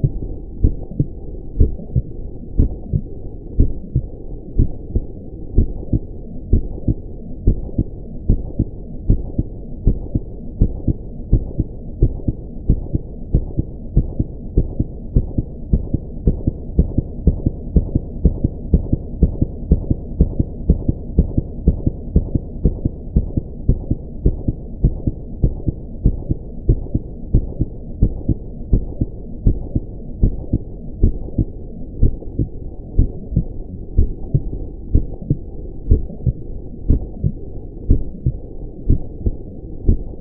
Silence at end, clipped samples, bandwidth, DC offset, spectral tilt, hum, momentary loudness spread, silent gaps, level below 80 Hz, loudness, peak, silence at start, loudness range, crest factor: 0 s; under 0.1%; 1.1 kHz; under 0.1%; -16 dB/octave; none; 11 LU; none; -22 dBFS; -22 LUFS; 0 dBFS; 0 s; 3 LU; 18 dB